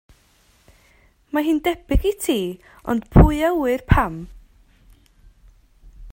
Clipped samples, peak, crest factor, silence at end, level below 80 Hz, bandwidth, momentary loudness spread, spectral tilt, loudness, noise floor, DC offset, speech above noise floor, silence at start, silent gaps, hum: under 0.1%; 0 dBFS; 22 dB; 0 s; -28 dBFS; 16.5 kHz; 15 LU; -6.5 dB/octave; -20 LUFS; -57 dBFS; under 0.1%; 39 dB; 1.35 s; none; none